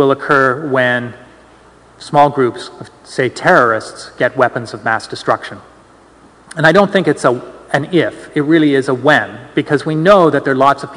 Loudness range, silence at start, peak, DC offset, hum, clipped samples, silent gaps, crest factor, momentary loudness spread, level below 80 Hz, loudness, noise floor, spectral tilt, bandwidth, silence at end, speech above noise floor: 3 LU; 0 s; 0 dBFS; under 0.1%; none; 0.5%; none; 14 dB; 11 LU; -52 dBFS; -13 LUFS; -44 dBFS; -6 dB/octave; 12 kHz; 0 s; 31 dB